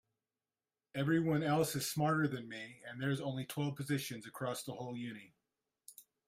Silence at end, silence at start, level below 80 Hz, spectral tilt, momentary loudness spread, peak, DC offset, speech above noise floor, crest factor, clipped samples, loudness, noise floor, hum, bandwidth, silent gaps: 0.25 s; 0.95 s; -74 dBFS; -5.5 dB/octave; 14 LU; -22 dBFS; under 0.1%; over 53 dB; 18 dB; under 0.1%; -37 LUFS; under -90 dBFS; none; 16 kHz; none